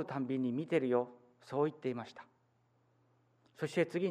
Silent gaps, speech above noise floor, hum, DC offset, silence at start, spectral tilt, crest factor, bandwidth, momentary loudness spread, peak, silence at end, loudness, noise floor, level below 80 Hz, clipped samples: none; 38 dB; none; under 0.1%; 0 s; -7 dB/octave; 18 dB; 11 kHz; 12 LU; -20 dBFS; 0 s; -36 LUFS; -74 dBFS; -86 dBFS; under 0.1%